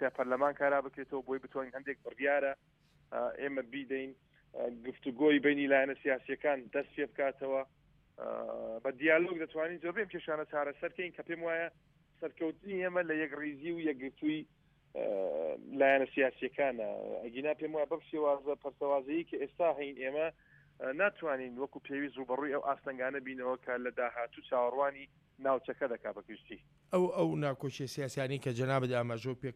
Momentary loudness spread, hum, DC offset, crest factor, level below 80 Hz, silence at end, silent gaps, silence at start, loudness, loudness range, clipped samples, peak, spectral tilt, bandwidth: 12 LU; none; under 0.1%; 22 dB; -74 dBFS; 0 s; none; 0 s; -35 LUFS; 5 LU; under 0.1%; -14 dBFS; -6.5 dB/octave; 13 kHz